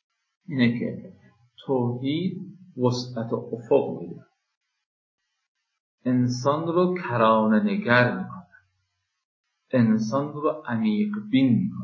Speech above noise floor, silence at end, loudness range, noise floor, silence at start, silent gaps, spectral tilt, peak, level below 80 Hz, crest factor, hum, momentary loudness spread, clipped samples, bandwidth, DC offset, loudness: 53 dB; 0 s; 6 LU; -76 dBFS; 0.5 s; 4.57-4.61 s, 4.86-5.18 s, 5.48-5.55 s, 5.80-5.98 s, 9.25-9.44 s; -7 dB/octave; -4 dBFS; -68 dBFS; 22 dB; none; 13 LU; under 0.1%; 7.4 kHz; under 0.1%; -24 LUFS